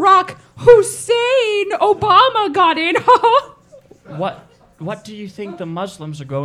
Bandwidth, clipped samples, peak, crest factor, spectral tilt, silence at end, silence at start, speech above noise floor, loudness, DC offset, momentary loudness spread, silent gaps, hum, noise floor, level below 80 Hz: 14 kHz; under 0.1%; 0 dBFS; 16 dB; -4 dB/octave; 0 s; 0 s; 31 dB; -14 LUFS; under 0.1%; 19 LU; none; none; -45 dBFS; -50 dBFS